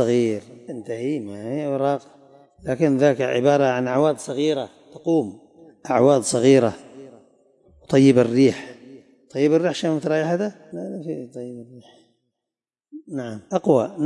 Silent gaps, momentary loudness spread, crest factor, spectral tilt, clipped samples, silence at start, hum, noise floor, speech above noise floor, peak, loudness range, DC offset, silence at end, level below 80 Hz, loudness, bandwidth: none; 18 LU; 18 dB; -6 dB/octave; under 0.1%; 0 s; none; -88 dBFS; 68 dB; -4 dBFS; 8 LU; under 0.1%; 0 s; -66 dBFS; -21 LUFS; 11.5 kHz